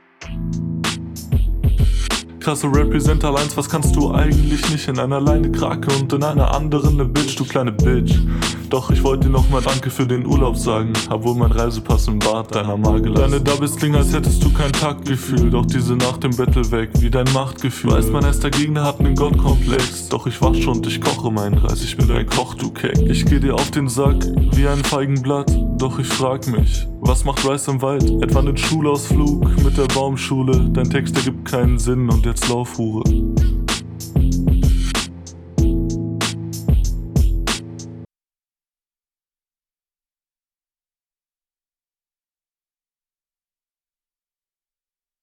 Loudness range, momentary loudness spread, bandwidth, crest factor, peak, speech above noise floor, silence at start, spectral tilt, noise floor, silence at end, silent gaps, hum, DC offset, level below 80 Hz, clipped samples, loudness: 3 LU; 6 LU; 15.5 kHz; 16 dB; -2 dBFS; over 74 dB; 0.2 s; -5.5 dB/octave; under -90 dBFS; 7.15 s; none; none; under 0.1%; -22 dBFS; under 0.1%; -18 LUFS